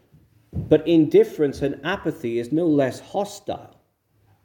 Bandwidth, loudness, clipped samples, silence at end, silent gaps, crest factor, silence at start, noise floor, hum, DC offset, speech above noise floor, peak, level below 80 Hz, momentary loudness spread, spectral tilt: 18 kHz; -21 LUFS; under 0.1%; 0.8 s; none; 20 dB; 0.55 s; -64 dBFS; none; under 0.1%; 43 dB; -4 dBFS; -52 dBFS; 16 LU; -7 dB/octave